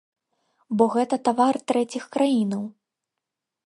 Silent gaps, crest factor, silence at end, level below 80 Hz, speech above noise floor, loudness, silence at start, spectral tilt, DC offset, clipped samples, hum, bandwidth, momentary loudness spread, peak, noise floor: none; 20 dB; 0.95 s; -74 dBFS; 63 dB; -23 LUFS; 0.7 s; -6 dB/octave; under 0.1%; under 0.1%; none; 11.5 kHz; 9 LU; -4 dBFS; -85 dBFS